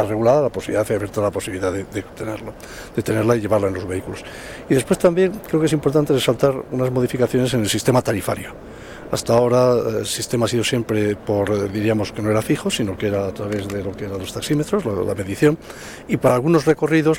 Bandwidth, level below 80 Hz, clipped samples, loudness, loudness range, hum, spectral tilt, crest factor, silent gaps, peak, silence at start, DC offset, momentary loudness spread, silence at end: 17.5 kHz; -46 dBFS; under 0.1%; -20 LUFS; 4 LU; none; -5.5 dB/octave; 14 dB; none; -4 dBFS; 0 s; under 0.1%; 12 LU; 0 s